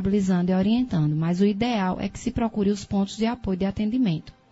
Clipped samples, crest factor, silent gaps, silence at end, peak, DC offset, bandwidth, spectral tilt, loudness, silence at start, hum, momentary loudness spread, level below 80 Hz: under 0.1%; 14 dB; none; 0.2 s; -10 dBFS; under 0.1%; 8 kHz; -7 dB/octave; -24 LUFS; 0 s; none; 5 LU; -46 dBFS